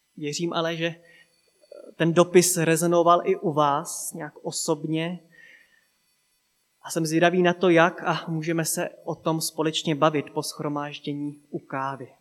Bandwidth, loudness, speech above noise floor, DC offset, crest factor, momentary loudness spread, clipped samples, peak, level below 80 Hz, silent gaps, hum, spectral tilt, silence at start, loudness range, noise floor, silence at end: 16 kHz; -24 LUFS; 46 dB; under 0.1%; 22 dB; 13 LU; under 0.1%; -2 dBFS; -80 dBFS; none; none; -4.5 dB/octave; 0.15 s; 6 LU; -70 dBFS; 0.15 s